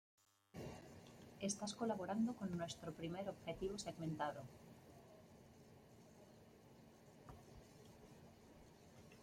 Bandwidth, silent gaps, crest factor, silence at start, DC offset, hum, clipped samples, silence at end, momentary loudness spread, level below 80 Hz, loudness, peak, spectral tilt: 16.5 kHz; none; 20 dB; 0.55 s; under 0.1%; none; under 0.1%; 0 s; 22 LU; -72 dBFS; -47 LUFS; -30 dBFS; -5 dB/octave